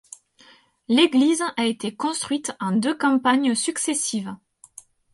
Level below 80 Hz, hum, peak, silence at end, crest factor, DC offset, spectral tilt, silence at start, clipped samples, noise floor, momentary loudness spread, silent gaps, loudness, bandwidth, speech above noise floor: -70 dBFS; none; -4 dBFS; 0.75 s; 18 dB; under 0.1%; -3 dB/octave; 0.9 s; under 0.1%; -54 dBFS; 9 LU; none; -22 LUFS; 11.5 kHz; 33 dB